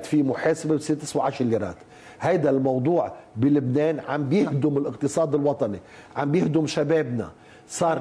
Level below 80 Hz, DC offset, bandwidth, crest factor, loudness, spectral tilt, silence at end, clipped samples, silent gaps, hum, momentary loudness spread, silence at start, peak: -62 dBFS; under 0.1%; 11 kHz; 12 dB; -24 LUFS; -6.5 dB/octave; 0 s; under 0.1%; none; none; 9 LU; 0 s; -10 dBFS